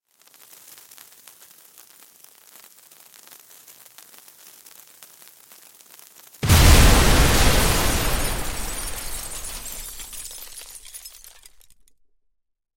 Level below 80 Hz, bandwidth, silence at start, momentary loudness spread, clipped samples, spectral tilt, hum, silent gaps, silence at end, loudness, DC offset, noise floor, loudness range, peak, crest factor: -26 dBFS; 17 kHz; 6.4 s; 29 LU; under 0.1%; -3.5 dB/octave; none; none; 1.7 s; -20 LUFS; under 0.1%; -68 dBFS; 17 LU; -2 dBFS; 20 dB